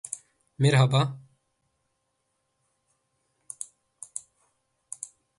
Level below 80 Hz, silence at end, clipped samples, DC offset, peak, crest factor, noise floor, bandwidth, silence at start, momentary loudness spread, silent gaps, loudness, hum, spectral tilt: -66 dBFS; 0.35 s; under 0.1%; under 0.1%; -8 dBFS; 22 dB; -77 dBFS; 11.5 kHz; 0.1 s; 23 LU; none; -24 LUFS; none; -5 dB/octave